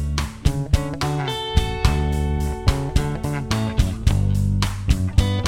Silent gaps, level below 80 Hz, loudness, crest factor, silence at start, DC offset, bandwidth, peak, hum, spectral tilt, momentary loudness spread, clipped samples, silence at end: none; -24 dBFS; -22 LUFS; 18 dB; 0 s; under 0.1%; 16.5 kHz; -2 dBFS; none; -6 dB/octave; 4 LU; under 0.1%; 0 s